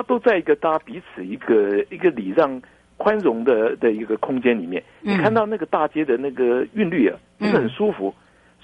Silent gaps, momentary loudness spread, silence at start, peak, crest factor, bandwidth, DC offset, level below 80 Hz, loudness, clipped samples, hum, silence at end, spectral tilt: none; 10 LU; 0 s; -4 dBFS; 16 dB; 8.2 kHz; under 0.1%; -60 dBFS; -21 LUFS; under 0.1%; none; 0.5 s; -8 dB/octave